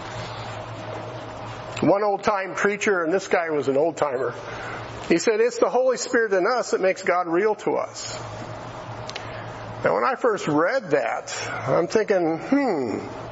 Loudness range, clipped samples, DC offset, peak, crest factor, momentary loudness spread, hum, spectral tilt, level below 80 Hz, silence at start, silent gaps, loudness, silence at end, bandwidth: 4 LU; under 0.1%; under 0.1%; -6 dBFS; 18 dB; 13 LU; none; -4.5 dB/octave; -56 dBFS; 0 s; none; -23 LUFS; 0 s; 8 kHz